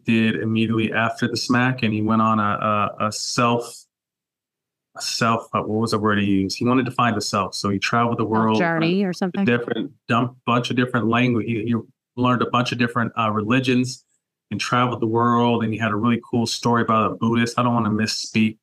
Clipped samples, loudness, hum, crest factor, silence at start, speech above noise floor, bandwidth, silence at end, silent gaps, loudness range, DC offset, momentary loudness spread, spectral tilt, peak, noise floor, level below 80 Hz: under 0.1%; -21 LUFS; none; 16 dB; 0.05 s; 67 dB; 13 kHz; 0.1 s; none; 3 LU; under 0.1%; 5 LU; -5.5 dB/octave; -6 dBFS; -87 dBFS; -62 dBFS